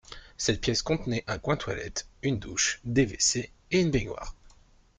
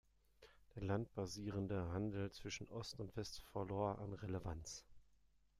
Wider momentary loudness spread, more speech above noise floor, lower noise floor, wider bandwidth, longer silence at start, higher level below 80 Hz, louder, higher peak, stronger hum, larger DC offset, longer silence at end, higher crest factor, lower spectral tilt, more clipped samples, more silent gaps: first, 10 LU vs 7 LU; about the same, 30 dB vs 28 dB; second, -58 dBFS vs -74 dBFS; second, 10 kHz vs 14 kHz; second, 0.1 s vs 0.4 s; first, -46 dBFS vs -64 dBFS; first, -28 LUFS vs -47 LUFS; first, -10 dBFS vs -26 dBFS; neither; neither; about the same, 0.5 s vs 0.55 s; about the same, 20 dB vs 20 dB; second, -3.5 dB/octave vs -5.5 dB/octave; neither; neither